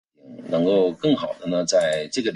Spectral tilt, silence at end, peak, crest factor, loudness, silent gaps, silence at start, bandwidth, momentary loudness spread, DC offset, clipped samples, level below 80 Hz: -4.5 dB/octave; 0 s; -8 dBFS; 14 dB; -22 LUFS; none; 0.25 s; 11.5 kHz; 6 LU; under 0.1%; under 0.1%; -62 dBFS